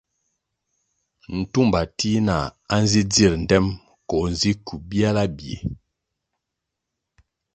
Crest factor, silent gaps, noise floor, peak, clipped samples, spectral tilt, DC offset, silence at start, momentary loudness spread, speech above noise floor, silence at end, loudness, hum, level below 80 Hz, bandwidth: 22 dB; none; -82 dBFS; -2 dBFS; under 0.1%; -5 dB/octave; under 0.1%; 1.3 s; 13 LU; 61 dB; 1.8 s; -21 LUFS; none; -40 dBFS; 9.2 kHz